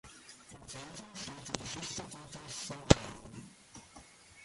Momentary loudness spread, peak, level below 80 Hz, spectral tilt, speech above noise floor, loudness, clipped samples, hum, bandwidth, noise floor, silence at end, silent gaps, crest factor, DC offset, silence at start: 24 LU; -4 dBFS; -48 dBFS; -4.5 dB/octave; 22 dB; -36 LUFS; under 0.1%; none; 11.5 kHz; -57 dBFS; 0 s; none; 36 dB; under 0.1%; 0.05 s